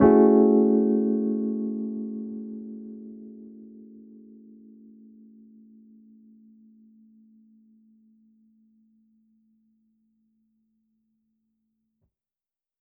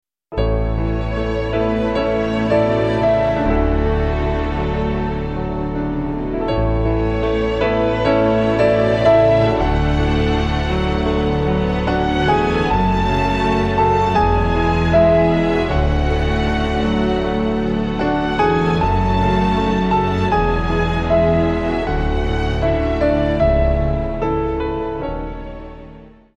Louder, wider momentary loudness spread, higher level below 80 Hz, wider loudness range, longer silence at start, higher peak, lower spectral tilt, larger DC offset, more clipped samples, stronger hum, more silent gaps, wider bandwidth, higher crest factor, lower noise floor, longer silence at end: second, -23 LUFS vs -17 LUFS; first, 29 LU vs 7 LU; second, -60 dBFS vs -24 dBFS; first, 29 LU vs 4 LU; second, 0 s vs 0.3 s; second, -6 dBFS vs -2 dBFS; about the same, -6.5 dB/octave vs -7.5 dB/octave; neither; neither; neither; neither; second, 2.3 kHz vs 8.6 kHz; first, 22 dB vs 16 dB; first, under -90 dBFS vs -40 dBFS; first, 9.3 s vs 0.3 s